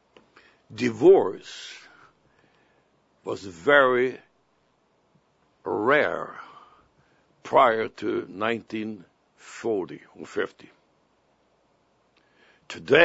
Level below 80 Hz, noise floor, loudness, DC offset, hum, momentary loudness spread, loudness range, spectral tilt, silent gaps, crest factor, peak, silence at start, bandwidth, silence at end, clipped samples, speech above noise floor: -72 dBFS; -67 dBFS; -24 LUFS; under 0.1%; none; 24 LU; 11 LU; -5 dB/octave; none; 24 dB; -2 dBFS; 0.7 s; 8 kHz; 0 s; under 0.1%; 44 dB